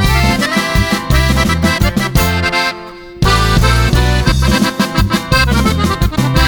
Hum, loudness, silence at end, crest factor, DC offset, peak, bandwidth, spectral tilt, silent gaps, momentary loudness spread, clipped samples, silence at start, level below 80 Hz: none; -12 LUFS; 0 s; 12 dB; under 0.1%; 0 dBFS; over 20 kHz; -5 dB/octave; none; 3 LU; under 0.1%; 0 s; -18 dBFS